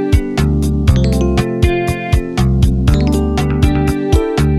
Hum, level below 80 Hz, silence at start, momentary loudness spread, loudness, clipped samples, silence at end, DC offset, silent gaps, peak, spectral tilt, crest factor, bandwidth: none; -18 dBFS; 0 s; 3 LU; -14 LUFS; under 0.1%; 0 s; under 0.1%; none; 0 dBFS; -7 dB/octave; 12 dB; 14 kHz